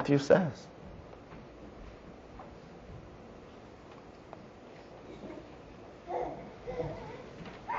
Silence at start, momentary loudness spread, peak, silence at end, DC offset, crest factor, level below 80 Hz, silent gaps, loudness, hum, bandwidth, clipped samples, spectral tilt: 0 s; 17 LU; -10 dBFS; 0 s; under 0.1%; 28 dB; -58 dBFS; none; -34 LUFS; none; 7.6 kHz; under 0.1%; -6 dB/octave